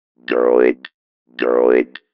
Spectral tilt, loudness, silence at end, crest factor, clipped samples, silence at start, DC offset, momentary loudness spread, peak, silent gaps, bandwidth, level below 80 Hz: -8 dB/octave; -16 LUFS; 0.3 s; 16 dB; under 0.1%; 0.3 s; under 0.1%; 13 LU; 0 dBFS; 0.94-1.26 s; 5.6 kHz; -64 dBFS